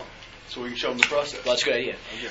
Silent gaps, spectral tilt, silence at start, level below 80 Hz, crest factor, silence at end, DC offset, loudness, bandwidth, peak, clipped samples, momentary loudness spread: none; -2 dB/octave; 0 s; -54 dBFS; 28 dB; 0 s; under 0.1%; -25 LUFS; 11 kHz; 0 dBFS; under 0.1%; 17 LU